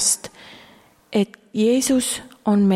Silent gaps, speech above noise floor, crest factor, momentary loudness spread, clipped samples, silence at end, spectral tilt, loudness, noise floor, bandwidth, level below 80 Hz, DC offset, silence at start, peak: none; 32 dB; 14 dB; 7 LU; under 0.1%; 0 s; -4 dB/octave; -21 LUFS; -51 dBFS; 15.5 kHz; -58 dBFS; under 0.1%; 0 s; -6 dBFS